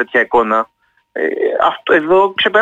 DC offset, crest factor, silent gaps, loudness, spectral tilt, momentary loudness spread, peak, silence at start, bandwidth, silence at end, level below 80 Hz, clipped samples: under 0.1%; 12 dB; none; -14 LUFS; -5 dB/octave; 9 LU; -2 dBFS; 0 s; 7.6 kHz; 0 s; -54 dBFS; under 0.1%